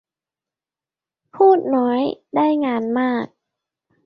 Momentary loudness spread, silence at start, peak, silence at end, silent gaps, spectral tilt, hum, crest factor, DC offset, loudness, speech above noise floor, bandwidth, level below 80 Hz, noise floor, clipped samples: 8 LU; 1.35 s; -2 dBFS; 0.8 s; none; -8.5 dB/octave; none; 18 dB; under 0.1%; -18 LUFS; over 72 dB; 5.6 kHz; -68 dBFS; under -90 dBFS; under 0.1%